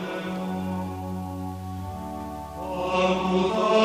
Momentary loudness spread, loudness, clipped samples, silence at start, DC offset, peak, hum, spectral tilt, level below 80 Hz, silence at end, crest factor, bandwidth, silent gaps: 12 LU; -28 LUFS; under 0.1%; 0 s; under 0.1%; -10 dBFS; none; -6 dB/octave; -48 dBFS; 0 s; 18 dB; 15.5 kHz; none